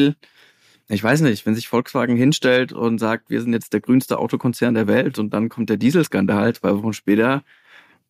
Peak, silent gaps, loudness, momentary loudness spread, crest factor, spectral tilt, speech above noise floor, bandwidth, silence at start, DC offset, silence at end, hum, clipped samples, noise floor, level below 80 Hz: -4 dBFS; none; -19 LUFS; 5 LU; 16 dB; -6 dB/octave; 36 dB; 15.5 kHz; 0 s; under 0.1%; 0.7 s; none; under 0.1%; -54 dBFS; -64 dBFS